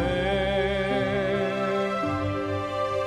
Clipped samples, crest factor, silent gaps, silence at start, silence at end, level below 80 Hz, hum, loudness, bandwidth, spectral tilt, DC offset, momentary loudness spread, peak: under 0.1%; 12 dB; none; 0 s; 0 s; -42 dBFS; none; -26 LUFS; 12.5 kHz; -6.5 dB/octave; under 0.1%; 3 LU; -12 dBFS